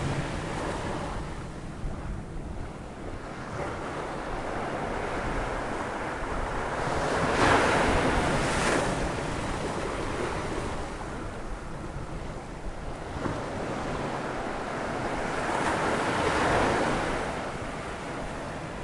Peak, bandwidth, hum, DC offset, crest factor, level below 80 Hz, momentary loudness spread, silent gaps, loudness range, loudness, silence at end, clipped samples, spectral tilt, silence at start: -10 dBFS; 11.5 kHz; none; under 0.1%; 20 dB; -40 dBFS; 14 LU; none; 10 LU; -30 LUFS; 0 s; under 0.1%; -5 dB/octave; 0 s